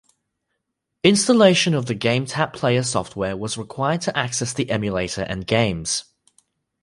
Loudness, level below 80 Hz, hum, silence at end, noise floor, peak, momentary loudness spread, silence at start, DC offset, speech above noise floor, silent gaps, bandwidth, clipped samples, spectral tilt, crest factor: -20 LUFS; -50 dBFS; none; 0.8 s; -78 dBFS; -2 dBFS; 11 LU; 1.05 s; under 0.1%; 58 dB; none; 11.5 kHz; under 0.1%; -4.5 dB/octave; 20 dB